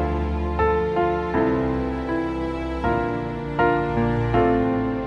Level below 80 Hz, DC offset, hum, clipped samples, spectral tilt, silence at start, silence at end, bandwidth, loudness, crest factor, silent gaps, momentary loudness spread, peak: -32 dBFS; under 0.1%; none; under 0.1%; -9 dB/octave; 0 s; 0 s; 8.4 kHz; -23 LUFS; 14 dB; none; 6 LU; -8 dBFS